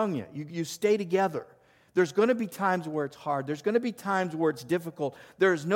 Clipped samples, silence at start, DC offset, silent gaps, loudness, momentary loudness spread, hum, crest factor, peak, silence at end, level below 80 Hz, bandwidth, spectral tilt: under 0.1%; 0 s; under 0.1%; none; -29 LUFS; 9 LU; none; 16 dB; -12 dBFS; 0 s; -74 dBFS; 17 kHz; -6 dB/octave